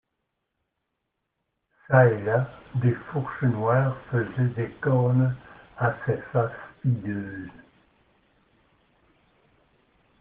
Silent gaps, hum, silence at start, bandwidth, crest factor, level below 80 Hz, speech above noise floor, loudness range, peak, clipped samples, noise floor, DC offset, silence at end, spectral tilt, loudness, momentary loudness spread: none; none; 1.9 s; 3.6 kHz; 22 dB; -62 dBFS; 56 dB; 11 LU; -4 dBFS; under 0.1%; -80 dBFS; under 0.1%; 2.7 s; -8.5 dB/octave; -25 LUFS; 12 LU